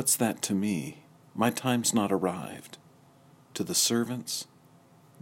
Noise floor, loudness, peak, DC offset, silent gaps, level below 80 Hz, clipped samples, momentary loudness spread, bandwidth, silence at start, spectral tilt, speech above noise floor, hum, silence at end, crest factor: -58 dBFS; -28 LUFS; -12 dBFS; under 0.1%; none; -74 dBFS; under 0.1%; 17 LU; 16.5 kHz; 0 s; -3.5 dB/octave; 29 dB; none; 0.8 s; 20 dB